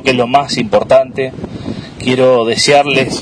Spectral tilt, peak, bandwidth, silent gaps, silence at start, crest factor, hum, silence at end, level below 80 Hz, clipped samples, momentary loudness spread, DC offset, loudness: -4 dB/octave; 0 dBFS; 10.5 kHz; none; 0 s; 12 dB; none; 0 s; -44 dBFS; 0.3%; 15 LU; under 0.1%; -11 LUFS